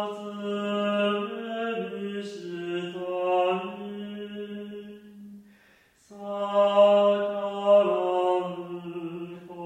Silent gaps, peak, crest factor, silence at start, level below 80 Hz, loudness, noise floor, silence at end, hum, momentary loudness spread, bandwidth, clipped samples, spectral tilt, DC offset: none; -8 dBFS; 18 dB; 0 s; -76 dBFS; -26 LUFS; -60 dBFS; 0 s; none; 18 LU; 9 kHz; under 0.1%; -6.5 dB/octave; under 0.1%